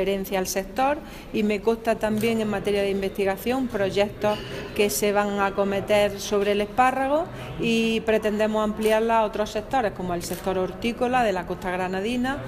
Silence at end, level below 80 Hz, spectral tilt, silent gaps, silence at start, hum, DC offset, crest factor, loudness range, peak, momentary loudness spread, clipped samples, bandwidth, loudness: 0 s; -46 dBFS; -4.5 dB/octave; none; 0 s; none; under 0.1%; 16 dB; 2 LU; -8 dBFS; 6 LU; under 0.1%; 16 kHz; -24 LUFS